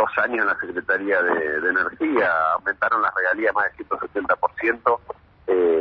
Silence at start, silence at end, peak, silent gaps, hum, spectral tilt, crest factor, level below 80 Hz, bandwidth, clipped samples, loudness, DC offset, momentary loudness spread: 0 s; 0 s; -4 dBFS; none; none; -7 dB/octave; 18 dB; -58 dBFS; 6 kHz; under 0.1%; -21 LUFS; under 0.1%; 6 LU